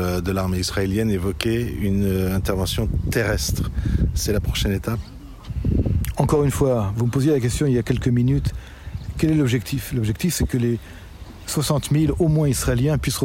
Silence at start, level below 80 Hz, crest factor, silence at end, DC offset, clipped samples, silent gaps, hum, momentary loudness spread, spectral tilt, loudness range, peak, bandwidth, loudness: 0 s; -30 dBFS; 18 dB; 0 s; under 0.1%; under 0.1%; none; none; 10 LU; -6 dB/octave; 3 LU; -4 dBFS; 16.5 kHz; -22 LUFS